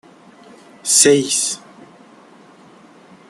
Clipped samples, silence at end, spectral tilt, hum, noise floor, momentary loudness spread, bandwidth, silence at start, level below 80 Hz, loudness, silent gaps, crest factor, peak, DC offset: under 0.1%; 1.75 s; -2 dB/octave; none; -45 dBFS; 17 LU; 13 kHz; 0.85 s; -66 dBFS; -14 LUFS; none; 20 dB; 0 dBFS; under 0.1%